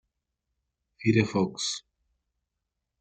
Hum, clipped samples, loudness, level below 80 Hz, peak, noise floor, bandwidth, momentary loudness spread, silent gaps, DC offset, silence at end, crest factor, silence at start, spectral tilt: none; under 0.1%; -27 LUFS; -66 dBFS; -8 dBFS; -84 dBFS; 9.2 kHz; 7 LU; none; under 0.1%; 1.2 s; 24 dB; 1 s; -5 dB/octave